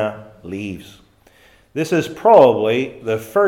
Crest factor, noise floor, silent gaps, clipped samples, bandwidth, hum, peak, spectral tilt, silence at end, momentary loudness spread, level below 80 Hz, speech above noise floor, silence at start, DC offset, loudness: 18 dB; -51 dBFS; none; under 0.1%; 16.5 kHz; none; 0 dBFS; -6 dB/octave; 0 s; 21 LU; -58 dBFS; 35 dB; 0 s; under 0.1%; -15 LUFS